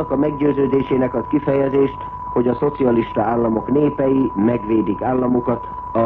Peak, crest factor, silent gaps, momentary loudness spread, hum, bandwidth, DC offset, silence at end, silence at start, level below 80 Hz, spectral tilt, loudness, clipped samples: -6 dBFS; 12 dB; none; 4 LU; none; 4.1 kHz; under 0.1%; 0 s; 0 s; -42 dBFS; -11 dB/octave; -18 LUFS; under 0.1%